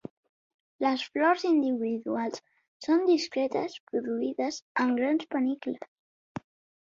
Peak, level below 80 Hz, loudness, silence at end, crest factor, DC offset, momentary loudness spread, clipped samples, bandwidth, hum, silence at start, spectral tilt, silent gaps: -12 dBFS; -74 dBFS; -28 LUFS; 0.45 s; 16 dB; under 0.1%; 19 LU; under 0.1%; 7.6 kHz; none; 0.8 s; -4.5 dB/octave; 2.68-2.80 s, 3.80-3.87 s, 4.62-4.75 s, 5.88-6.35 s